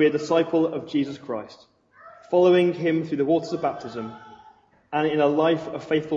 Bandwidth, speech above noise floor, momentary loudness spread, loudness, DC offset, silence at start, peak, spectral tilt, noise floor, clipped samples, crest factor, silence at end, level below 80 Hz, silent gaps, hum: 7.6 kHz; 32 dB; 15 LU; -23 LUFS; under 0.1%; 0 s; -8 dBFS; -7 dB/octave; -55 dBFS; under 0.1%; 16 dB; 0 s; -68 dBFS; none; none